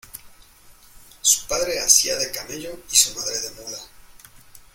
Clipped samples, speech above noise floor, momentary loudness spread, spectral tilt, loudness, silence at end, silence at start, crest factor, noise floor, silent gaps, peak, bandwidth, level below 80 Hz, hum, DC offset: under 0.1%; 27 dB; 19 LU; 1 dB/octave; -19 LUFS; 0.15 s; 0.15 s; 24 dB; -49 dBFS; none; 0 dBFS; 17 kHz; -50 dBFS; none; under 0.1%